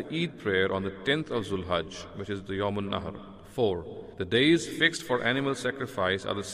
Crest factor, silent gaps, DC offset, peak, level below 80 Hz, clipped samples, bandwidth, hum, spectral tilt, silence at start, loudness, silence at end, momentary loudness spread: 20 dB; none; under 0.1%; -10 dBFS; -58 dBFS; under 0.1%; 15.5 kHz; none; -4.5 dB/octave; 0 s; -28 LUFS; 0 s; 14 LU